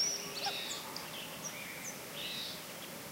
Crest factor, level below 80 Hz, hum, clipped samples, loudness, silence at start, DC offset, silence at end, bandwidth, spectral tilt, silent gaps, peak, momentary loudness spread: 18 dB; -74 dBFS; none; under 0.1%; -40 LUFS; 0 s; under 0.1%; 0 s; 16 kHz; -1 dB/octave; none; -24 dBFS; 6 LU